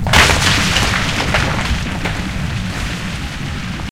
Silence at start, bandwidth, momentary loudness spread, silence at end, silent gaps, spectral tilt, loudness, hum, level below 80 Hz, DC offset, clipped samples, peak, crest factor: 0 s; 17 kHz; 13 LU; 0 s; none; -3.5 dB/octave; -16 LUFS; none; -24 dBFS; 1%; under 0.1%; 0 dBFS; 16 dB